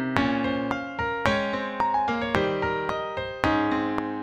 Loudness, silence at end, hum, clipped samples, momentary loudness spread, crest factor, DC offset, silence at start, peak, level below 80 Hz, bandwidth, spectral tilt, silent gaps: -26 LUFS; 0 s; none; under 0.1%; 5 LU; 24 dB; under 0.1%; 0 s; -2 dBFS; -48 dBFS; 13 kHz; -6 dB/octave; none